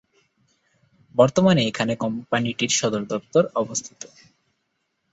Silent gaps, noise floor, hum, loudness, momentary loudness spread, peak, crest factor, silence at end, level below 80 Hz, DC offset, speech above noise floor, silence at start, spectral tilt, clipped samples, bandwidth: none; -74 dBFS; none; -22 LUFS; 11 LU; -4 dBFS; 20 dB; 1.1 s; -60 dBFS; under 0.1%; 53 dB; 1.15 s; -4.5 dB/octave; under 0.1%; 8.2 kHz